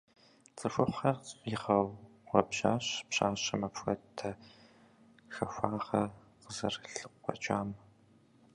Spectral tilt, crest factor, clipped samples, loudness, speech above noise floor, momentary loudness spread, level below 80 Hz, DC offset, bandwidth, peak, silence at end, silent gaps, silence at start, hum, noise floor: -4.5 dB/octave; 26 dB; under 0.1%; -35 LUFS; 30 dB; 12 LU; -64 dBFS; under 0.1%; 11 kHz; -8 dBFS; 0.75 s; none; 0.55 s; none; -64 dBFS